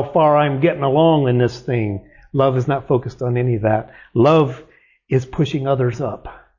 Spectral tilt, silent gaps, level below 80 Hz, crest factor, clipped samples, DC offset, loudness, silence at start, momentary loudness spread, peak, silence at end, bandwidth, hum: -8.5 dB/octave; none; -46 dBFS; 14 dB; under 0.1%; under 0.1%; -18 LUFS; 0 s; 11 LU; -4 dBFS; 0.2 s; 7.4 kHz; none